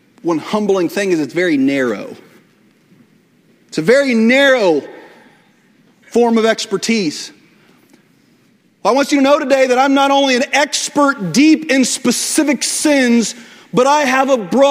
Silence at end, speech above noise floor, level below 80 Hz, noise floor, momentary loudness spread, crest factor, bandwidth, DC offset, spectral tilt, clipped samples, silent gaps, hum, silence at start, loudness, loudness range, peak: 0 s; 40 dB; -62 dBFS; -53 dBFS; 9 LU; 14 dB; 16 kHz; under 0.1%; -3.5 dB/octave; under 0.1%; none; none; 0.25 s; -13 LUFS; 6 LU; 0 dBFS